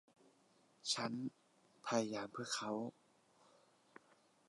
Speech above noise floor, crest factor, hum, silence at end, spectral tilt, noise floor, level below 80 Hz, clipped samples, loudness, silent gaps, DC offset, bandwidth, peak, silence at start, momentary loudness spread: 31 dB; 22 dB; none; 1.6 s; -3 dB/octave; -73 dBFS; -90 dBFS; under 0.1%; -43 LUFS; none; under 0.1%; 11.5 kHz; -24 dBFS; 0.85 s; 10 LU